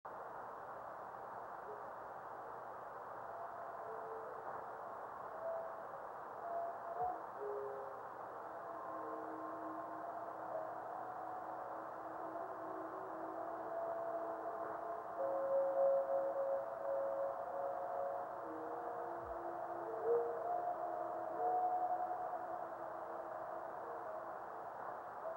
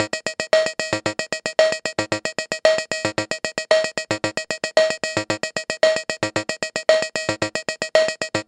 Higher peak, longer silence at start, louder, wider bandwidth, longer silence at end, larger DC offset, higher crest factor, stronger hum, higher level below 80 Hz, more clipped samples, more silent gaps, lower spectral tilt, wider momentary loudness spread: second, -26 dBFS vs 0 dBFS; about the same, 0.05 s vs 0 s; second, -44 LUFS vs -21 LUFS; first, 16 kHz vs 11 kHz; about the same, 0 s vs 0.05 s; neither; about the same, 18 dB vs 22 dB; neither; second, -80 dBFS vs -60 dBFS; neither; neither; first, -7 dB/octave vs -2.5 dB/octave; first, 11 LU vs 6 LU